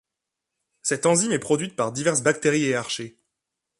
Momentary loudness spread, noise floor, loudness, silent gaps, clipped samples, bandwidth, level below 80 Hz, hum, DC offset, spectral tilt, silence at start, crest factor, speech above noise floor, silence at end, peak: 10 LU; -85 dBFS; -23 LUFS; none; under 0.1%; 11.5 kHz; -66 dBFS; none; under 0.1%; -3.5 dB/octave; 0.85 s; 20 dB; 62 dB; 0.7 s; -6 dBFS